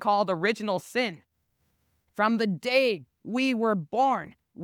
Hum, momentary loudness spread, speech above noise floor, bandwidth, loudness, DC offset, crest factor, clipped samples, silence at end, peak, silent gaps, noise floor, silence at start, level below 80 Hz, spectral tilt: none; 9 LU; 48 dB; 18 kHz; -26 LUFS; under 0.1%; 16 dB; under 0.1%; 0 s; -10 dBFS; none; -74 dBFS; 0 s; -74 dBFS; -5.5 dB/octave